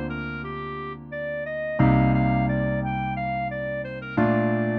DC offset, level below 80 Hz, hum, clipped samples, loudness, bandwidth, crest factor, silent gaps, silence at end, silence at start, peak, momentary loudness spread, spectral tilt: under 0.1%; -40 dBFS; none; under 0.1%; -25 LUFS; 4.9 kHz; 16 dB; none; 0 s; 0 s; -8 dBFS; 12 LU; -10.5 dB/octave